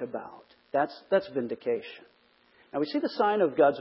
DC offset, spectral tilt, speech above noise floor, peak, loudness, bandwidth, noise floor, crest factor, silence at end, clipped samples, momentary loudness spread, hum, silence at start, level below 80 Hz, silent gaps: under 0.1%; -9.5 dB/octave; 35 dB; -10 dBFS; -29 LUFS; 5.8 kHz; -63 dBFS; 18 dB; 0 s; under 0.1%; 16 LU; none; 0 s; -76 dBFS; none